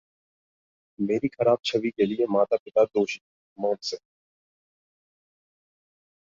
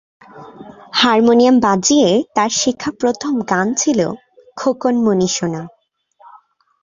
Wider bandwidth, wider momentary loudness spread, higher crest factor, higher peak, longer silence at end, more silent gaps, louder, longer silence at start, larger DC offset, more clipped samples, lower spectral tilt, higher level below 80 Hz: about the same, 7.6 kHz vs 7.6 kHz; about the same, 9 LU vs 11 LU; first, 20 dB vs 14 dB; second, -8 dBFS vs -2 dBFS; first, 2.35 s vs 1.15 s; first, 2.60-2.66 s, 3.21-3.56 s vs none; second, -25 LUFS vs -15 LUFS; first, 1 s vs 0.35 s; neither; neither; first, -5.5 dB/octave vs -3.5 dB/octave; second, -70 dBFS vs -56 dBFS